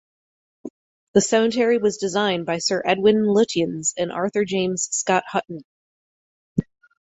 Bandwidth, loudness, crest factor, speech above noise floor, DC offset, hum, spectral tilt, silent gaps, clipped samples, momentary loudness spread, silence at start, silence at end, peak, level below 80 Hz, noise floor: 8.4 kHz; -21 LUFS; 20 dB; over 70 dB; under 0.1%; none; -4 dB/octave; 0.70-1.14 s, 5.65-6.56 s; under 0.1%; 15 LU; 0.65 s; 0.4 s; -2 dBFS; -60 dBFS; under -90 dBFS